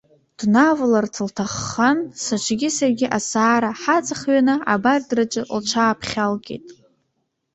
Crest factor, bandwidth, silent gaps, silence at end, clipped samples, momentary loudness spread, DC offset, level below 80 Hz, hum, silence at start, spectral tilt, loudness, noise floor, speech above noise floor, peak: 16 dB; 8.2 kHz; none; 0.8 s; under 0.1%; 9 LU; under 0.1%; -56 dBFS; none; 0.4 s; -4 dB/octave; -19 LUFS; -73 dBFS; 53 dB; -4 dBFS